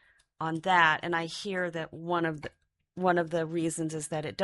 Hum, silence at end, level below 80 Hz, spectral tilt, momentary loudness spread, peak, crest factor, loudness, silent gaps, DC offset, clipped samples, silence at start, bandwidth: none; 0 s; -68 dBFS; -4.5 dB/octave; 14 LU; -8 dBFS; 22 dB; -29 LUFS; none; under 0.1%; under 0.1%; 0.4 s; 11.5 kHz